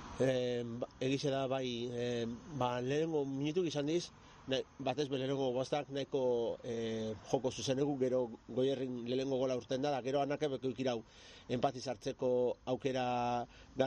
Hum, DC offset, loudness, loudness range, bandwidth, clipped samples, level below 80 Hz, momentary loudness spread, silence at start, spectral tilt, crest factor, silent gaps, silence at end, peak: none; under 0.1%; -37 LUFS; 1 LU; 9.8 kHz; under 0.1%; -66 dBFS; 6 LU; 0 s; -5.5 dB/octave; 18 dB; none; 0 s; -18 dBFS